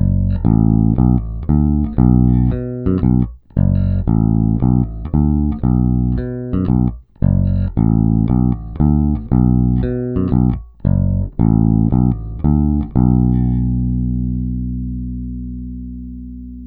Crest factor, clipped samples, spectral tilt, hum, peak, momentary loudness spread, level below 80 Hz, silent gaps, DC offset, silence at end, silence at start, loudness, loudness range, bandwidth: 14 dB; under 0.1%; -14.5 dB/octave; 60 Hz at -35 dBFS; 0 dBFS; 10 LU; -22 dBFS; none; under 0.1%; 0 s; 0 s; -16 LUFS; 2 LU; 2.9 kHz